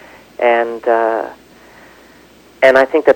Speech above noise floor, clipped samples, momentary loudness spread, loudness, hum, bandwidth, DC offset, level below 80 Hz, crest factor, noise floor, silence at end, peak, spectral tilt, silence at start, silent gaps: 32 dB; under 0.1%; 14 LU; -13 LUFS; none; 17 kHz; under 0.1%; -56 dBFS; 16 dB; -44 dBFS; 0 s; 0 dBFS; -4.5 dB/octave; 0.4 s; none